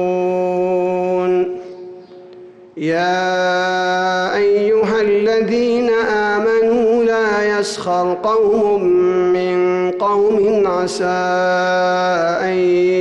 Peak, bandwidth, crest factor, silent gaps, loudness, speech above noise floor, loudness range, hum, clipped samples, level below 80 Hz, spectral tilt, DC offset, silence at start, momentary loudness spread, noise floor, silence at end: -8 dBFS; 11.5 kHz; 8 dB; none; -16 LUFS; 24 dB; 4 LU; none; under 0.1%; -54 dBFS; -5.5 dB/octave; under 0.1%; 0 s; 4 LU; -39 dBFS; 0 s